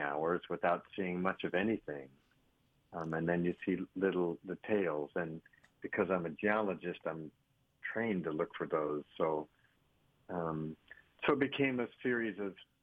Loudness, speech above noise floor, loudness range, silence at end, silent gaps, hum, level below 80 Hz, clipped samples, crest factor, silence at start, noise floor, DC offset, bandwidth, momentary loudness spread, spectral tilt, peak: -37 LUFS; 37 dB; 3 LU; 0.2 s; none; none; -72 dBFS; under 0.1%; 20 dB; 0 s; -74 dBFS; under 0.1%; 4.9 kHz; 11 LU; -8.5 dB/octave; -16 dBFS